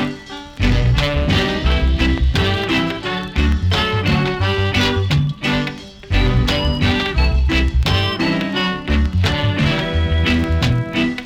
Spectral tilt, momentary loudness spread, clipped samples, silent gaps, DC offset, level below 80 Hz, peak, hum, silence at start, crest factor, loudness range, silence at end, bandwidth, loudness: -6 dB/octave; 4 LU; under 0.1%; none; under 0.1%; -22 dBFS; -4 dBFS; none; 0 s; 14 dB; 0 LU; 0 s; 13.5 kHz; -17 LUFS